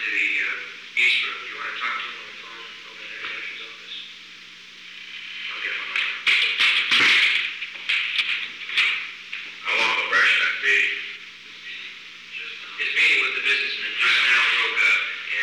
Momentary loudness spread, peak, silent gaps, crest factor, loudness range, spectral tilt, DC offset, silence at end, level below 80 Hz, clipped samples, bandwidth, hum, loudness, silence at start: 20 LU; -10 dBFS; none; 14 dB; 12 LU; 0.5 dB/octave; under 0.1%; 0 s; -74 dBFS; under 0.1%; 15 kHz; none; -20 LUFS; 0 s